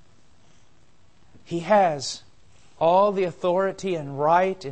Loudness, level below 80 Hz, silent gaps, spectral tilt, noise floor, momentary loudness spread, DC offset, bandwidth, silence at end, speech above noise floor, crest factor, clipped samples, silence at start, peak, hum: -23 LUFS; -62 dBFS; none; -5 dB/octave; -60 dBFS; 12 LU; 0.3%; 8.8 kHz; 0 s; 38 dB; 18 dB; under 0.1%; 1.5 s; -6 dBFS; none